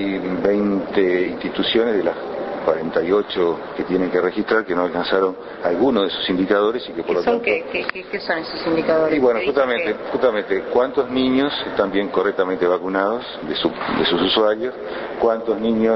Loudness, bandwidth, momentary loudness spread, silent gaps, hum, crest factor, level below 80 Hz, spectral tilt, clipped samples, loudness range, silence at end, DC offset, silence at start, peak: -20 LUFS; 6 kHz; 6 LU; none; none; 18 dB; -52 dBFS; -7.5 dB/octave; under 0.1%; 1 LU; 0 s; under 0.1%; 0 s; -2 dBFS